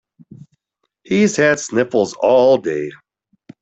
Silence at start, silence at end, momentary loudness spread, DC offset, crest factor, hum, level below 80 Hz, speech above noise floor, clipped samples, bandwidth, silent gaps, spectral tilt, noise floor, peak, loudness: 1.1 s; 0.65 s; 10 LU; under 0.1%; 16 dB; none; -58 dBFS; 58 dB; under 0.1%; 8.2 kHz; none; -5 dB/octave; -73 dBFS; -2 dBFS; -16 LUFS